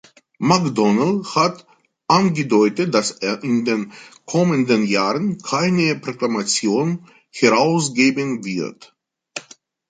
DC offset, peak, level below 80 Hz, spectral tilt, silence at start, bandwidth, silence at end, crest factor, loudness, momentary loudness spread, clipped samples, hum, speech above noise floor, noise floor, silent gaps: under 0.1%; -2 dBFS; -62 dBFS; -5 dB/octave; 0.4 s; 9.4 kHz; 0.5 s; 18 dB; -18 LUFS; 14 LU; under 0.1%; none; 30 dB; -48 dBFS; none